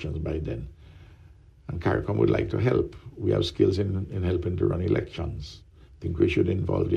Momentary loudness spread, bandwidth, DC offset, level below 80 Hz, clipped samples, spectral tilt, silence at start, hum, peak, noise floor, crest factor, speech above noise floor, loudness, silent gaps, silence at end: 14 LU; 9.2 kHz; under 0.1%; -42 dBFS; under 0.1%; -8 dB/octave; 0 s; none; -8 dBFS; -52 dBFS; 18 dB; 26 dB; -27 LUFS; none; 0 s